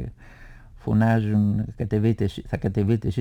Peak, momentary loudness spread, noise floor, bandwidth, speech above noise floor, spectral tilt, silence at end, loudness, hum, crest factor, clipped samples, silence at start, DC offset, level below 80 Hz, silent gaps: -10 dBFS; 8 LU; -45 dBFS; 8.4 kHz; 23 dB; -9 dB/octave; 0 s; -23 LUFS; none; 12 dB; under 0.1%; 0 s; under 0.1%; -42 dBFS; none